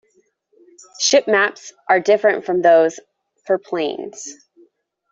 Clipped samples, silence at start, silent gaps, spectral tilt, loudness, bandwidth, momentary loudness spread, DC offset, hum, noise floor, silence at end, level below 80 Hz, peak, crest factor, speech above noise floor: under 0.1%; 1 s; none; -2.5 dB/octave; -17 LUFS; 7.8 kHz; 17 LU; under 0.1%; none; -62 dBFS; 0.8 s; -70 dBFS; -2 dBFS; 16 dB; 45 dB